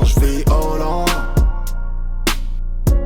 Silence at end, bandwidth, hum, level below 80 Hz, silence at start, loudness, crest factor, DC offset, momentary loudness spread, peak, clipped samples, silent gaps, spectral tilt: 0 s; 18 kHz; none; -16 dBFS; 0 s; -20 LUFS; 10 dB; under 0.1%; 11 LU; -4 dBFS; under 0.1%; none; -5.5 dB/octave